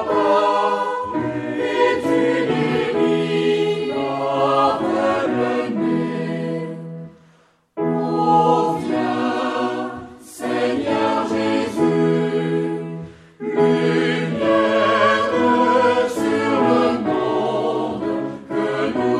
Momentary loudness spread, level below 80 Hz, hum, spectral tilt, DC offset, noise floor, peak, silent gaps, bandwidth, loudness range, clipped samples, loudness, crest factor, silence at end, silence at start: 10 LU; -60 dBFS; none; -6 dB/octave; under 0.1%; -55 dBFS; -4 dBFS; none; 13 kHz; 4 LU; under 0.1%; -19 LUFS; 14 dB; 0 s; 0 s